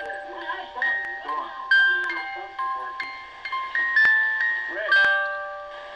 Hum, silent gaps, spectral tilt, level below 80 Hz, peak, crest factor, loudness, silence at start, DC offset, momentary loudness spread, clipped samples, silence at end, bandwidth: none; none; -1.5 dB/octave; -64 dBFS; -10 dBFS; 14 dB; -22 LUFS; 0 s; under 0.1%; 15 LU; under 0.1%; 0 s; 9.2 kHz